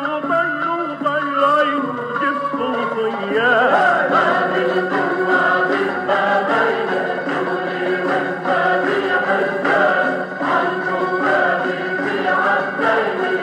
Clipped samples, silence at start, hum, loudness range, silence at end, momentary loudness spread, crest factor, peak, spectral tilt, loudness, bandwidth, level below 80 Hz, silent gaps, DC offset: under 0.1%; 0 s; none; 2 LU; 0 s; 6 LU; 16 dB; -2 dBFS; -5.5 dB/octave; -18 LUFS; 10.5 kHz; -76 dBFS; none; under 0.1%